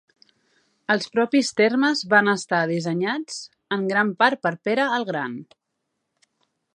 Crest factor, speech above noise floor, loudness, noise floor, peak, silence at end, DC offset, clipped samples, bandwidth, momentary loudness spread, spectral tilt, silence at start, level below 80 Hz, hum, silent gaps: 22 dB; 56 dB; -22 LUFS; -78 dBFS; -2 dBFS; 1.3 s; under 0.1%; under 0.1%; 11 kHz; 12 LU; -4.5 dB/octave; 0.9 s; -76 dBFS; none; none